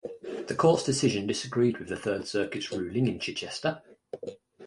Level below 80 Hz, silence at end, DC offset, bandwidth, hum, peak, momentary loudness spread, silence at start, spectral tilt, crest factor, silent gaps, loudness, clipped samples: -60 dBFS; 0 s; under 0.1%; 11.5 kHz; none; -8 dBFS; 17 LU; 0.05 s; -5 dB/octave; 20 dB; none; -29 LUFS; under 0.1%